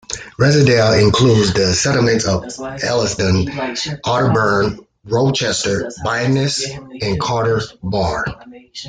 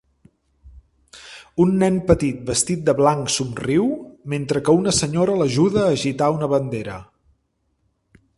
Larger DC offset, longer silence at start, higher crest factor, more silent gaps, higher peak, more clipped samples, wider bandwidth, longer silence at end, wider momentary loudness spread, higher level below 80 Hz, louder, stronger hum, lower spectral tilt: neither; second, 0.1 s vs 0.65 s; second, 14 dB vs 20 dB; neither; about the same, -2 dBFS vs 0 dBFS; neither; second, 9.6 kHz vs 11.5 kHz; second, 0 s vs 1.35 s; about the same, 11 LU vs 12 LU; about the same, -42 dBFS vs -46 dBFS; first, -16 LUFS vs -20 LUFS; neither; about the same, -5 dB/octave vs -5 dB/octave